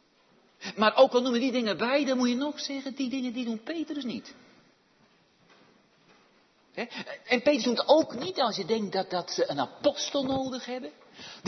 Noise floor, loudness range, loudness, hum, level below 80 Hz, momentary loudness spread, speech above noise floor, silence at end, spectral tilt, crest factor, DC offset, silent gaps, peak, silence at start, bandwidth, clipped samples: -64 dBFS; 13 LU; -28 LUFS; none; -72 dBFS; 16 LU; 36 dB; 0 s; -4 dB/octave; 22 dB; under 0.1%; none; -8 dBFS; 0.6 s; 6.4 kHz; under 0.1%